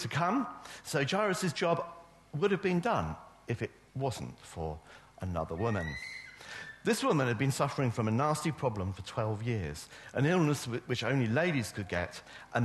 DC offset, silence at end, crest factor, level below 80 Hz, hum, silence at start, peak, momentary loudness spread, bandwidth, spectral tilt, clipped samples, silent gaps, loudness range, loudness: under 0.1%; 0 s; 18 dB; -58 dBFS; none; 0 s; -14 dBFS; 14 LU; 12.5 kHz; -5.5 dB/octave; under 0.1%; none; 5 LU; -33 LUFS